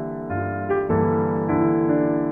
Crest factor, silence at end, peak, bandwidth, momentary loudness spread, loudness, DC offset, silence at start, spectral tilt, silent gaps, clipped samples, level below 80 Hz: 12 dB; 0 s; -8 dBFS; 3.2 kHz; 7 LU; -22 LUFS; 0.2%; 0 s; -12 dB/octave; none; under 0.1%; -50 dBFS